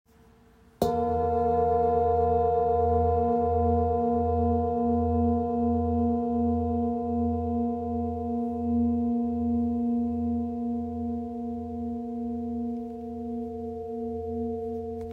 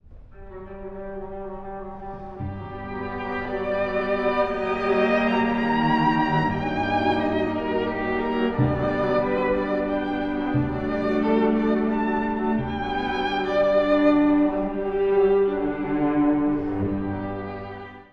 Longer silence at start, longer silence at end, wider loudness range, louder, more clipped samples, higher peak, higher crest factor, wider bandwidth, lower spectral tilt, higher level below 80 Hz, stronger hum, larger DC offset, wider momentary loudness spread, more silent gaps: first, 0.8 s vs 0.1 s; about the same, 0 s vs 0.1 s; first, 9 LU vs 6 LU; second, -27 LUFS vs -23 LUFS; neither; about the same, -10 dBFS vs -8 dBFS; about the same, 18 dB vs 16 dB; first, 15.5 kHz vs 6.6 kHz; first, -10 dB/octave vs -8.5 dB/octave; about the same, -46 dBFS vs -42 dBFS; neither; neither; second, 10 LU vs 15 LU; neither